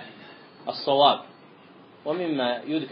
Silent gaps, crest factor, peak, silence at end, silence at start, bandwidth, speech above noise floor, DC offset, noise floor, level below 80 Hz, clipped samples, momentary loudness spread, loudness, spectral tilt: none; 22 dB; -4 dBFS; 0 s; 0 s; 5.4 kHz; 27 dB; under 0.1%; -51 dBFS; -82 dBFS; under 0.1%; 19 LU; -24 LUFS; -2 dB/octave